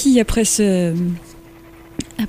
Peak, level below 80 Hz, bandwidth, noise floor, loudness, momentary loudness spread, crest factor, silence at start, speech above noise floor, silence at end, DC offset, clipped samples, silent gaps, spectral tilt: -4 dBFS; -34 dBFS; 16 kHz; -42 dBFS; -17 LUFS; 16 LU; 16 dB; 0 s; 25 dB; 0 s; under 0.1%; under 0.1%; none; -4.5 dB/octave